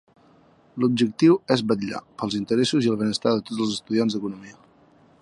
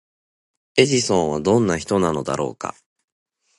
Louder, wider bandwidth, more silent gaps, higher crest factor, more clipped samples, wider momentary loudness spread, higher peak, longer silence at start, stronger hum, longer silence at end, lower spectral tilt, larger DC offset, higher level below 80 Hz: second, -23 LUFS vs -20 LUFS; about the same, 11.5 kHz vs 11.5 kHz; neither; about the same, 20 dB vs 20 dB; neither; about the same, 12 LU vs 10 LU; second, -4 dBFS vs 0 dBFS; about the same, 0.75 s vs 0.75 s; neither; second, 0.7 s vs 0.9 s; about the same, -5.5 dB/octave vs -4.5 dB/octave; neither; second, -64 dBFS vs -50 dBFS